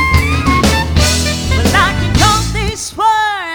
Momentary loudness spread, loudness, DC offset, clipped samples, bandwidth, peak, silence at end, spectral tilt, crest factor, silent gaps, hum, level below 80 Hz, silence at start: 4 LU; -12 LUFS; under 0.1%; under 0.1%; over 20 kHz; 0 dBFS; 0 s; -4 dB/octave; 12 dB; none; none; -20 dBFS; 0 s